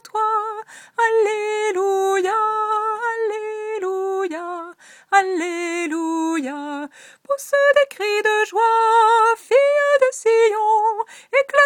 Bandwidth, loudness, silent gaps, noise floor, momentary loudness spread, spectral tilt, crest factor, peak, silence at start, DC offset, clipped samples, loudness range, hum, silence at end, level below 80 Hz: 16.5 kHz; -19 LUFS; none; -41 dBFS; 13 LU; -1 dB/octave; 18 dB; -2 dBFS; 0.15 s; under 0.1%; under 0.1%; 7 LU; none; 0 s; -78 dBFS